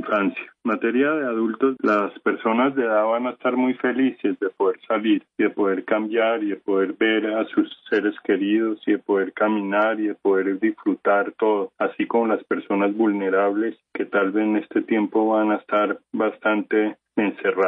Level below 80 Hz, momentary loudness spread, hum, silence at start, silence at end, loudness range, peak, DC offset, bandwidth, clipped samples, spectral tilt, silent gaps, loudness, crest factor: -76 dBFS; 4 LU; none; 0 s; 0 s; 1 LU; -8 dBFS; under 0.1%; 4.4 kHz; under 0.1%; -8 dB/octave; none; -22 LUFS; 14 dB